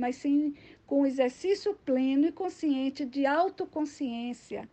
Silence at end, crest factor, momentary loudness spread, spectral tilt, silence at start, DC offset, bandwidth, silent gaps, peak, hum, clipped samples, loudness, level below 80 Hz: 0.05 s; 14 dB; 8 LU; -5 dB/octave; 0 s; under 0.1%; 8.6 kHz; none; -14 dBFS; none; under 0.1%; -29 LUFS; -70 dBFS